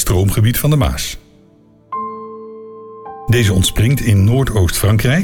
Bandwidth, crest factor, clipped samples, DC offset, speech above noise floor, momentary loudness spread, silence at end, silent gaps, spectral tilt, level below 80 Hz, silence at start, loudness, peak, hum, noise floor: 18.5 kHz; 10 dB; under 0.1%; under 0.1%; 35 dB; 20 LU; 0 s; none; -5.5 dB/octave; -28 dBFS; 0 s; -14 LUFS; -4 dBFS; none; -48 dBFS